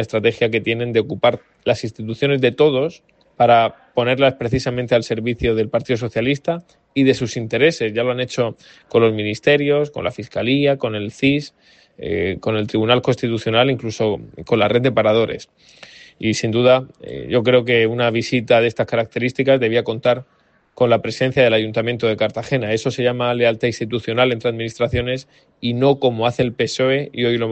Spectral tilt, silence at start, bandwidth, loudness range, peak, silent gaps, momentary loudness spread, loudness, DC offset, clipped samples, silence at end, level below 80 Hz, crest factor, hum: -6 dB/octave; 0 s; 8.6 kHz; 2 LU; 0 dBFS; none; 8 LU; -18 LUFS; under 0.1%; under 0.1%; 0 s; -48 dBFS; 18 dB; none